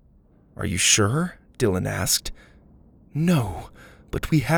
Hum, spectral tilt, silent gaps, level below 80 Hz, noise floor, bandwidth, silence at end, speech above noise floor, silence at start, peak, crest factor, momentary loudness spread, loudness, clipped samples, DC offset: none; -3.5 dB/octave; none; -44 dBFS; -55 dBFS; over 20 kHz; 0 s; 33 dB; 0.6 s; -4 dBFS; 20 dB; 16 LU; -23 LUFS; under 0.1%; under 0.1%